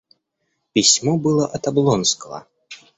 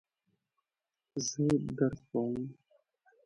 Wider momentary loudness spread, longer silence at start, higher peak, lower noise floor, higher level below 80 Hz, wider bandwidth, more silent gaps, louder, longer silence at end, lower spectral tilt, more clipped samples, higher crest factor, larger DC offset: about the same, 13 LU vs 11 LU; second, 0.75 s vs 1.15 s; first, -2 dBFS vs -16 dBFS; second, -73 dBFS vs under -90 dBFS; first, -56 dBFS vs -64 dBFS; second, 8.4 kHz vs 11.5 kHz; neither; first, -17 LUFS vs -34 LUFS; second, 0.2 s vs 0.75 s; second, -3.5 dB/octave vs -5.5 dB/octave; neither; about the same, 18 dB vs 20 dB; neither